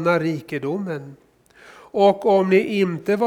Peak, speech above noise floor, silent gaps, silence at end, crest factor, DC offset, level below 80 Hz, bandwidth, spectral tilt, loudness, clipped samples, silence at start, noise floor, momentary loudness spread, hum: -2 dBFS; 30 dB; none; 0 s; 18 dB; under 0.1%; -66 dBFS; 14.5 kHz; -7 dB/octave; -20 LUFS; under 0.1%; 0 s; -49 dBFS; 13 LU; none